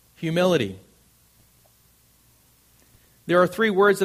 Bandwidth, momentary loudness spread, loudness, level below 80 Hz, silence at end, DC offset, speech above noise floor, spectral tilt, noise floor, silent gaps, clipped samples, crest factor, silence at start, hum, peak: 15.5 kHz; 18 LU; -21 LUFS; -62 dBFS; 0 s; under 0.1%; 39 dB; -5.5 dB/octave; -59 dBFS; none; under 0.1%; 20 dB; 0.2 s; none; -6 dBFS